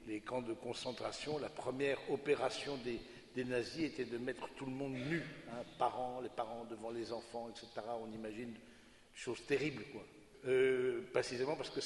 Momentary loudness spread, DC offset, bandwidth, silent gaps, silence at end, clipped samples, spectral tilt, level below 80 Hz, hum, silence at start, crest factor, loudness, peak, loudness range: 12 LU; under 0.1%; 11.5 kHz; none; 0 s; under 0.1%; -5 dB/octave; -70 dBFS; none; 0 s; 22 dB; -41 LUFS; -20 dBFS; 5 LU